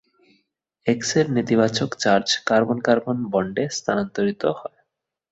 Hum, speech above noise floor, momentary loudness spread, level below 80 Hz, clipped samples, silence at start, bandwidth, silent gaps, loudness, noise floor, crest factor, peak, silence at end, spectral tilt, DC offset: none; 56 dB; 6 LU; -60 dBFS; under 0.1%; 0.85 s; 8.2 kHz; none; -21 LUFS; -77 dBFS; 20 dB; -2 dBFS; 0.65 s; -4.5 dB/octave; under 0.1%